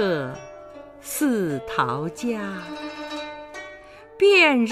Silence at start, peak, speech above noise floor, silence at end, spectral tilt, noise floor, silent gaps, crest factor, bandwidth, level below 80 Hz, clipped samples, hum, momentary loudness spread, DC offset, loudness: 0 s; -6 dBFS; 22 dB; 0 s; -4 dB/octave; -44 dBFS; none; 18 dB; 15.5 kHz; -58 dBFS; under 0.1%; 50 Hz at -55 dBFS; 25 LU; under 0.1%; -22 LUFS